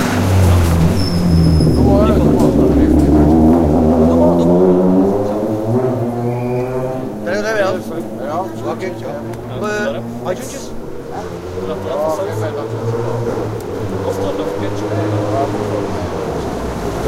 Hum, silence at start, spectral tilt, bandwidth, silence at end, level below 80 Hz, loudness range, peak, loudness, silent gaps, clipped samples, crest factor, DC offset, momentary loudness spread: none; 0 s; -7.5 dB/octave; 16 kHz; 0 s; -26 dBFS; 11 LU; -2 dBFS; -15 LUFS; none; under 0.1%; 14 dB; under 0.1%; 12 LU